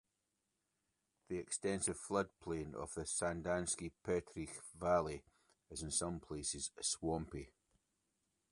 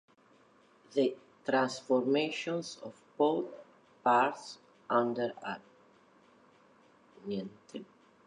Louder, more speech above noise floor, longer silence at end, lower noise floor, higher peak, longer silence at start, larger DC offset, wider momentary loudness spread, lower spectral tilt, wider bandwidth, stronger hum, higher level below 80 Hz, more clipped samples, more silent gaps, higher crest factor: second, -41 LUFS vs -32 LUFS; first, 46 dB vs 32 dB; first, 1.05 s vs 0.45 s; first, -87 dBFS vs -64 dBFS; second, -22 dBFS vs -16 dBFS; first, 1.3 s vs 0.9 s; neither; second, 11 LU vs 19 LU; second, -3.5 dB/octave vs -5 dB/octave; about the same, 11.5 kHz vs 11 kHz; neither; first, -62 dBFS vs -84 dBFS; neither; neither; about the same, 22 dB vs 20 dB